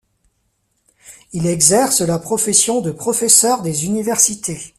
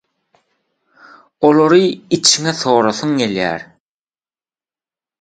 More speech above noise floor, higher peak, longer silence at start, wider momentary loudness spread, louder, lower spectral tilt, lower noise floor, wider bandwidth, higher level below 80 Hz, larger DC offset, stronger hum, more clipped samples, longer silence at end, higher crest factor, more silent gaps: second, 50 dB vs over 76 dB; about the same, 0 dBFS vs 0 dBFS; second, 1.1 s vs 1.4 s; about the same, 10 LU vs 8 LU; about the same, -14 LUFS vs -14 LUFS; about the same, -3 dB/octave vs -3.5 dB/octave; second, -66 dBFS vs under -90 dBFS; first, 16 kHz vs 9.4 kHz; first, -52 dBFS vs -58 dBFS; neither; neither; neither; second, 0.1 s vs 1.6 s; about the same, 18 dB vs 18 dB; neither